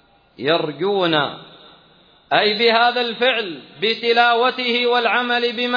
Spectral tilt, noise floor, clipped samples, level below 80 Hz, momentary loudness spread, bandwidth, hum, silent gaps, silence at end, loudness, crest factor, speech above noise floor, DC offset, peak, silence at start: -5.5 dB/octave; -52 dBFS; under 0.1%; -68 dBFS; 8 LU; 5.2 kHz; none; none; 0 s; -17 LUFS; 18 dB; 34 dB; under 0.1%; -2 dBFS; 0.4 s